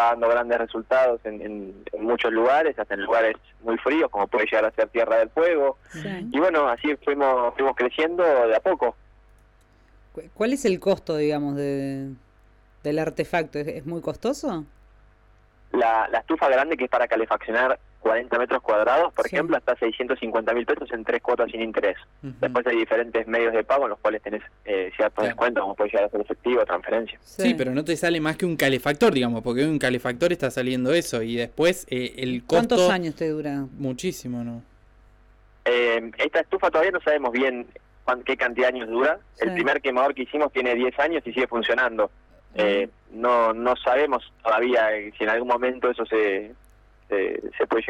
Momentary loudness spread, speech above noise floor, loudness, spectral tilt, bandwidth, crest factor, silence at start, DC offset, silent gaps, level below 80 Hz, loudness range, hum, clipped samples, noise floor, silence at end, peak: 9 LU; 33 dB; -23 LUFS; -5 dB/octave; 16.5 kHz; 14 dB; 0 s; under 0.1%; none; -54 dBFS; 4 LU; none; under 0.1%; -56 dBFS; 0 s; -10 dBFS